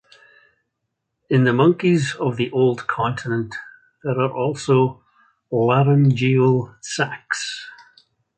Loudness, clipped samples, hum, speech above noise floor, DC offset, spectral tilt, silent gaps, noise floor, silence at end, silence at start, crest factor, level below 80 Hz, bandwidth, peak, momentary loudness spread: -19 LUFS; under 0.1%; none; 59 dB; under 0.1%; -6.5 dB/octave; none; -77 dBFS; 0.65 s; 1.3 s; 16 dB; -58 dBFS; 9 kHz; -4 dBFS; 12 LU